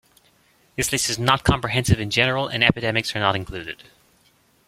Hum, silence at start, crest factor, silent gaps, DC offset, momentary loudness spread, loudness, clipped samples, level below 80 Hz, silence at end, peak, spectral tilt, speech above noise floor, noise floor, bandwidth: none; 0.8 s; 22 dB; none; under 0.1%; 14 LU; -20 LUFS; under 0.1%; -40 dBFS; 0.95 s; -2 dBFS; -3.5 dB/octave; 38 dB; -60 dBFS; 16.5 kHz